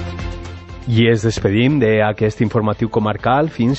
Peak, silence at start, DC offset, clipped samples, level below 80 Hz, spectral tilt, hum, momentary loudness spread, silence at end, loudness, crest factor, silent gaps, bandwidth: -2 dBFS; 0 s; under 0.1%; under 0.1%; -36 dBFS; -7 dB/octave; none; 14 LU; 0 s; -16 LUFS; 14 dB; none; 8.4 kHz